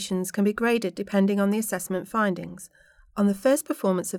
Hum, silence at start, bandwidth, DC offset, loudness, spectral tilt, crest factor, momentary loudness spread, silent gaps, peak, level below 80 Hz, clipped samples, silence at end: none; 0 s; 17.5 kHz; under 0.1%; -25 LUFS; -5.5 dB/octave; 16 dB; 9 LU; none; -10 dBFS; -62 dBFS; under 0.1%; 0 s